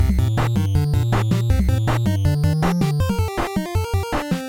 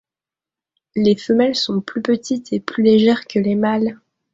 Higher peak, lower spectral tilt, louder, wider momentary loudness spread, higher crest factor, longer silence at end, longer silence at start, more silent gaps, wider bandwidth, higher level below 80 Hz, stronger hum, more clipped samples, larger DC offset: second, -6 dBFS vs -2 dBFS; about the same, -7 dB/octave vs -6 dB/octave; about the same, -20 LUFS vs -18 LUFS; second, 4 LU vs 9 LU; about the same, 12 dB vs 16 dB; second, 0 s vs 0.4 s; second, 0 s vs 0.95 s; neither; first, 17 kHz vs 7.8 kHz; first, -28 dBFS vs -58 dBFS; neither; neither; first, 0.2% vs under 0.1%